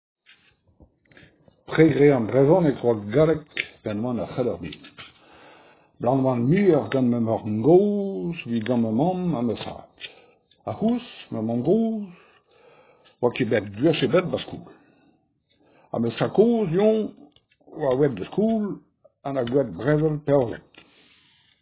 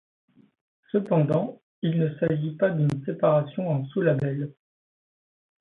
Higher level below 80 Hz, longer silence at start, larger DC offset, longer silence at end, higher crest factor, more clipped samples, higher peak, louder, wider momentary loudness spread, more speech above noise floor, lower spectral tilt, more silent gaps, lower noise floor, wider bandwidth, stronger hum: first, -56 dBFS vs -64 dBFS; first, 1.7 s vs 0.95 s; neither; about the same, 1 s vs 1.1 s; about the same, 20 dB vs 18 dB; neither; first, -4 dBFS vs -8 dBFS; about the same, -23 LUFS vs -25 LUFS; first, 18 LU vs 7 LU; second, 44 dB vs over 66 dB; first, -11.5 dB/octave vs -10 dB/octave; second, none vs 1.63-1.82 s; second, -66 dBFS vs under -90 dBFS; about the same, 4 kHz vs 4.1 kHz; neither